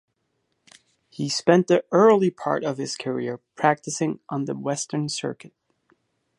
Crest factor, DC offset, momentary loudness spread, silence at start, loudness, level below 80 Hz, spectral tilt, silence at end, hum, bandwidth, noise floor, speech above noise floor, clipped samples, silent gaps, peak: 22 dB; under 0.1%; 13 LU; 1.2 s; -23 LUFS; -72 dBFS; -5 dB/octave; 0.9 s; none; 11.5 kHz; -74 dBFS; 51 dB; under 0.1%; none; -2 dBFS